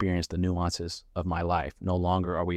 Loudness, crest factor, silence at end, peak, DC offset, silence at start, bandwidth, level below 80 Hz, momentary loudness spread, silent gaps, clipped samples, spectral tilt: -29 LUFS; 14 dB; 0 s; -14 dBFS; under 0.1%; 0 s; 11.5 kHz; -44 dBFS; 7 LU; none; under 0.1%; -6 dB/octave